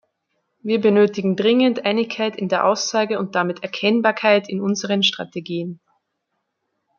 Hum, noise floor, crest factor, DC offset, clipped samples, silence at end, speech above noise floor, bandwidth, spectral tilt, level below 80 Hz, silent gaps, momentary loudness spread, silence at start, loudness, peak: none; -75 dBFS; 18 dB; under 0.1%; under 0.1%; 1.25 s; 56 dB; 7.2 kHz; -4.5 dB/octave; -70 dBFS; none; 11 LU; 0.65 s; -19 LUFS; -2 dBFS